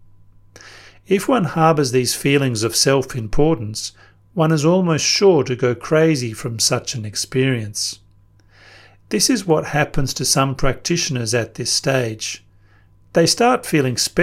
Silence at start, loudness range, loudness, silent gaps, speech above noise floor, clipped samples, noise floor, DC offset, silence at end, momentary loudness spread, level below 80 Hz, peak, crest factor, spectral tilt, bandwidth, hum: 0.65 s; 4 LU; -18 LUFS; none; 34 dB; under 0.1%; -51 dBFS; under 0.1%; 0 s; 9 LU; -38 dBFS; -2 dBFS; 18 dB; -4 dB/octave; 16.5 kHz; none